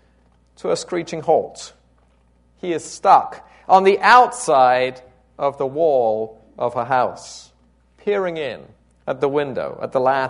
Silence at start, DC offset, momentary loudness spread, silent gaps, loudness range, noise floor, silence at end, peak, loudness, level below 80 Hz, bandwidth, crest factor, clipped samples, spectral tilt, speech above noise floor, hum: 0.65 s; under 0.1%; 19 LU; none; 8 LU; -57 dBFS; 0 s; 0 dBFS; -18 LUFS; -58 dBFS; 11 kHz; 20 dB; under 0.1%; -4 dB/octave; 39 dB; none